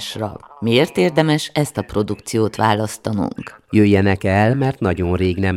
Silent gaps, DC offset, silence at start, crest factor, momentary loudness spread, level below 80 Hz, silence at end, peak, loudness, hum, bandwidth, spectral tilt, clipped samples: none; under 0.1%; 0 s; 18 dB; 10 LU; -44 dBFS; 0 s; 0 dBFS; -18 LUFS; none; 15 kHz; -6 dB/octave; under 0.1%